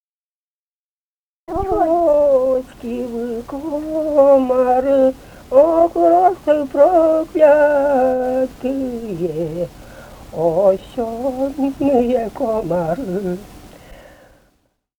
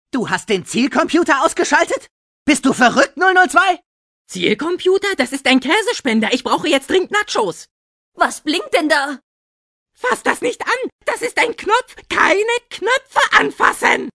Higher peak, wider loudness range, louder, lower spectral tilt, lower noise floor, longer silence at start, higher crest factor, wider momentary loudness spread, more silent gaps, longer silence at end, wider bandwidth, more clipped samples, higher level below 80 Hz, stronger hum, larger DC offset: about the same, 0 dBFS vs 0 dBFS; about the same, 7 LU vs 5 LU; about the same, -16 LUFS vs -16 LUFS; first, -7.5 dB/octave vs -3 dB/octave; about the same, under -90 dBFS vs under -90 dBFS; first, 1.5 s vs 0.15 s; about the same, 16 dB vs 16 dB; first, 13 LU vs 8 LU; second, none vs 2.11-2.46 s, 3.86-4.25 s, 7.71-8.12 s, 9.23-9.86 s, 10.92-10.99 s; first, 1.05 s vs 0.05 s; first, 19.5 kHz vs 11 kHz; neither; first, -44 dBFS vs -54 dBFS; neither; neither